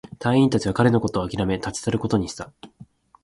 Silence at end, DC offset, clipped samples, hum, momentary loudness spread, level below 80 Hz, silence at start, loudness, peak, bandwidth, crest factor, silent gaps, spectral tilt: 0.4 s; under 0.1%; under 0.1%; none; 11 LU; -46 dBFS; 0.2 s; -22 LUFS; -4 dBFS; 11.5 kHz; 18 dB; none; -6 dB/octave